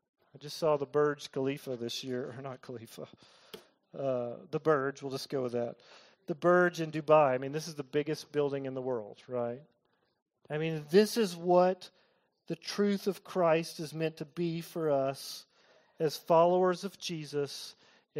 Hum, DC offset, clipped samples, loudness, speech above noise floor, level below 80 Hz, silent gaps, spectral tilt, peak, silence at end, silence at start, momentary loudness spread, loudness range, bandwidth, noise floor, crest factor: none; under 0.1%; under 0.1%; -32 LUFS; 34 dB; -80 dBFS; 10.22-10.26 s; -5.5 dB/octave; -12 dBFS; 0 s; 0.4 s; 19 LU; 6 LU; 16 kHz; -66 dBFS; 20 dB